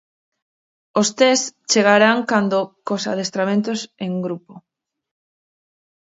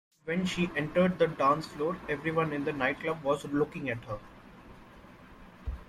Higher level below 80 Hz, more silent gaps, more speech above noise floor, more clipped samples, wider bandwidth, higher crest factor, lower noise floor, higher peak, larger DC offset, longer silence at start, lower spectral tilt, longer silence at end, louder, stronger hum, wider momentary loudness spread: second, -70 dBFS vs -52 dBFS; neither; first, over 72 dB vs 22 dB; neither; second, 8 kHz vs 14 kHz; about the same, 20 dB vs 18 dB; first, under -90 dBFS vs -52 dBFS; first, 0 dBFS vs -14 dBFS; neither; first, 0.95 s vs 0.25 s; second, -3.5 dB/octave vs -6.5 dB/octave; first, 1.5 s vs 0.05 s; first, -18 LUFS vs -30 LUFS; neither; about the same, 12 LU vs 11 LU